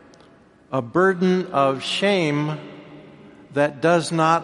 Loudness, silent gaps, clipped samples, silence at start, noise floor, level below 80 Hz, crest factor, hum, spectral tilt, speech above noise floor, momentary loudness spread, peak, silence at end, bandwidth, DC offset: -21 LUFS; none; under 0.1%; 0.7 s; -51 dBFS; -64 dBFS; 18 dB; none; -5.5 dB/octave; 32 dB; 11 LU; -4 dBFS; 0 s; 11.5 kHz; under 0.1%